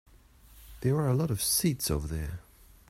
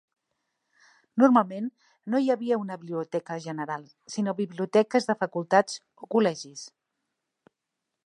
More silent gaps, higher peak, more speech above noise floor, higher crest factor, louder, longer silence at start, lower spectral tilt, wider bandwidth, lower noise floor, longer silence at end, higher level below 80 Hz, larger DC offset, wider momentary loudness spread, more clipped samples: neither; second, -16 dBFS vs -6 dBFS; second, 28 dB vs 58 dB; second, 16 dB vs 22 dB; about the same, -29 LUFS vs -27 LUFS; second, 0.55 s vs 1.15 s; about the same, -4.5 dB/octave vs -5.5 dB/octave; first, 16 kHz vs 11 kHz; second, -56 dBFS vs -84 dBFS; second, 0.5 s vs 1.4 s; first, -46 dBFS vs -82 dBFS; neither; second, 12 LU vs 15 LU; neither